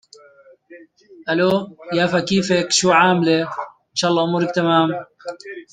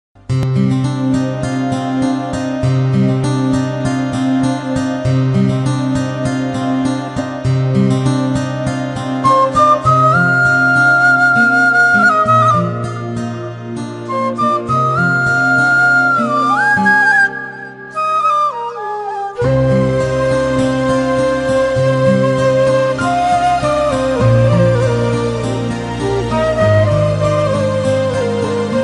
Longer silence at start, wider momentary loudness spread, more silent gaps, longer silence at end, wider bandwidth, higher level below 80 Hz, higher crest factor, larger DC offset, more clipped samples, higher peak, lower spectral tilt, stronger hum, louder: first, 0.7 s vs 0.3 s; first, 18 LU vs 10 LU; neither; about the same, 0.1 s vs 0 s; about the same, 9.6 kHz vs 10.5 kHz; second, -60 dBFS vs -38 dBFS; first, 18 dB vs 12 dB; neither; neither; about the same, -2 dBFS vs -2 dBFS; second, -4 dB/octave vs -6.5 dB/octave; neither; second, -18 LUFS vs -14 LUFS